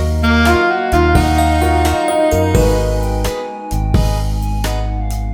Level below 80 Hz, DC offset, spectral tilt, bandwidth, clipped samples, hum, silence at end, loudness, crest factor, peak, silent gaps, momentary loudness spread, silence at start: -18 dBFS; under 0.1%; -6 dB/octave; 18 kHz; under 0.1%; none; 0 s; -15 LUFS; 14 dB; 0 dBFS; none; 9 LU; 0 s